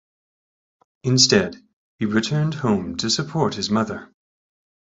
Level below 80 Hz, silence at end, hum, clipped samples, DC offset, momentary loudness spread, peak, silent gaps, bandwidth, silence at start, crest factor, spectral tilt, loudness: -54 dBFS; 0.85 s; none; under 0.1%; under 0.1%; 13 LU; -2 dBFS; 1.73-1.98 s; 8.4 kHz; 1.05 s; 20 dB; -4 dB/octave; -20 LUFS